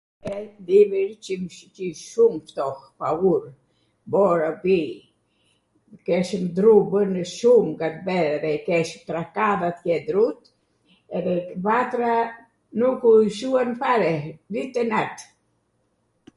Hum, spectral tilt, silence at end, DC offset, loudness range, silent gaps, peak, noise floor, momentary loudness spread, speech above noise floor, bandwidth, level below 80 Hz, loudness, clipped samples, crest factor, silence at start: none; -6.5 dB/octave; 1.15 s; under 0.1%; 4 LU; none; -4 dBFS; -69 dBFS; 15 LU; 48 dB; 11.5 kHz; -64 dBFS; -22 LUFS; under 0.1%; 18 dB; 0.25 s